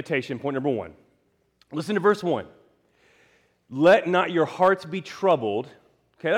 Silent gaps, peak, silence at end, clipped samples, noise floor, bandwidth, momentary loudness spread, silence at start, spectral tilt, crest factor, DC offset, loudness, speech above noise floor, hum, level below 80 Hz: none; -8 dBFS; 0 s; under 0.1%; -67 dBFS; 12.5 kHz; 15 LU; 0 s; -6 dB/octave; 16 dB; under 0.1%; -23 LUFS; 45 dB; none; -70 dBFS